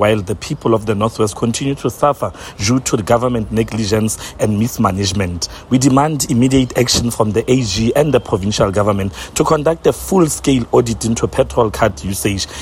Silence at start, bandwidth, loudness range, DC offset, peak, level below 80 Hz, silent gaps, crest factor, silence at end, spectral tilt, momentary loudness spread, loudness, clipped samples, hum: 0 s; 16.5 kHz; 3 LU; under 0.1%; 0 dBFS; -36 dBFS; none; 16 dB; 0 s; -5 dB/octave; 6 LU; -15 LUFS; under 0.1%; none